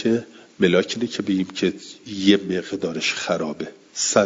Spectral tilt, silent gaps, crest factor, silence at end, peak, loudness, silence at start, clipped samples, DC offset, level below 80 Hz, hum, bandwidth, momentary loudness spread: -4 dB/octave; none; 20 dB; 0 s; -2 dBFS; -22 LUFS; 0 s; under 0.1%; under 0.1%; -64 dBFS; none; 7.8 kHz; 11 LU